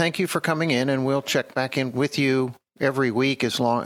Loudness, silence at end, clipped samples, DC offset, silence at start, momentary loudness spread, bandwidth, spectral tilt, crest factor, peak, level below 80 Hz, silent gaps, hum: -23 LUFS; 0 s; under 0.1%; under 0.1%; 0 s; 3 LU; 18 kHz; -5 dB/octave; 16 dB; -6 dBFS; -68 dBFS; none; none